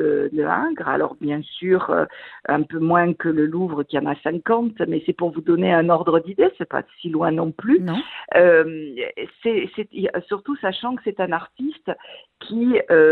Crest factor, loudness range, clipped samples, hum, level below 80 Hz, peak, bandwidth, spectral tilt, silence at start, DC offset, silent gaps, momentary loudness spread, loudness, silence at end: 18 dB; 6 LU; under 0.1%; none; -62 dBFS; -2 dBFS; 4.4 kHz; -10 dB/octave; 0 s; under 0.1%; none; 11 LU; -21 LUFS; 0 s